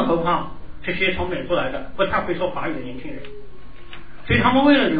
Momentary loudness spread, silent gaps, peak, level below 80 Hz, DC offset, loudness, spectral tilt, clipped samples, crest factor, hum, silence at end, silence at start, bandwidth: 23 LU; none; -4 dBFS; -38 dBFS; 3%; -21 LUFS; -9 dB/octave; under 0.1%; 18 dB; none; 0 s; 0 s; 5 kHz